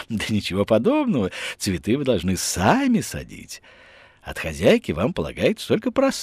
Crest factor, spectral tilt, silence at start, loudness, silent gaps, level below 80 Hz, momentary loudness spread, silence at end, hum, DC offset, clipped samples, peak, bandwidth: 18 dB; -5 dB/octave; 0 s; -22 LUFS; none; -48 dBFS; 16 LU; 0 s; none; under 0.1%; under 0.1%; -4 dBFS; 15.5 kHz